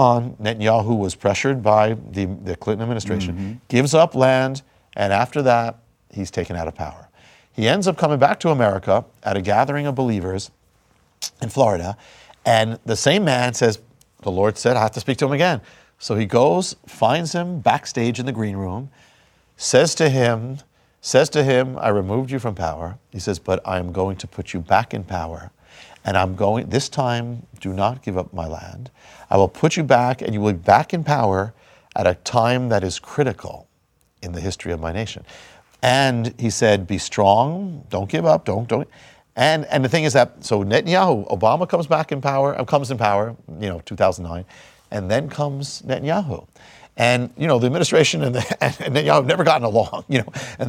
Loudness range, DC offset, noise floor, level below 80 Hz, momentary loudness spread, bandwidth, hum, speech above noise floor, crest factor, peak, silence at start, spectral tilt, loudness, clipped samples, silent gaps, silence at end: 5 LU; under 0.1%; -63 dBFS; -50 dBFS; 14 LU; 16 kHz; none; 44 dB; 20 dB; 0 dBFS; 0 s; -5 dB/octave; -20 LUFS; under 0.1%; none; 0 s